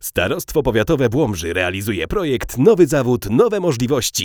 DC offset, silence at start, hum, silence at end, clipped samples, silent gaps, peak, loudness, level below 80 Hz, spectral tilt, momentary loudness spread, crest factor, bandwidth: under 0.1%; 0 s; none; 0 s; under 0.1%; none; 0 dBFS; -17 LUFS; -36 dBFS; -5 dB/octave; 6 LU; 16 dB; over 20 kHz